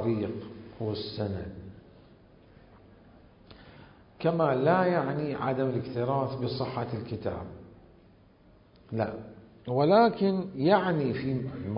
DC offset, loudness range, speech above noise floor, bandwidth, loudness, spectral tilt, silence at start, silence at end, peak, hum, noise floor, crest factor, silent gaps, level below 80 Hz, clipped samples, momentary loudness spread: under 0.1%; 12 LU; 30 dB; 5.4 kHz; -29 LUFS; -11 dB/octave; 0 s; 0 s; -10 dBFS; none; -58 dBFS; 20 dB; none; -56 dBFS; under 0.1%; 18 LU